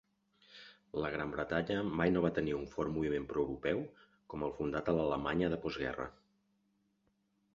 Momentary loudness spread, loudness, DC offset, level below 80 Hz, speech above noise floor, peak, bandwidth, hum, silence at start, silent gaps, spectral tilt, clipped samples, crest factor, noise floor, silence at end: 12 LU; -36 LUFS; under 0.1%; -58 dBFS; 42 dB; -16 dBFS; 7.4 kHz; none; 0.5 s; none; -5.5 dB/octave; under 0.1%; 22 dB; -78 dBFS; 1.45 s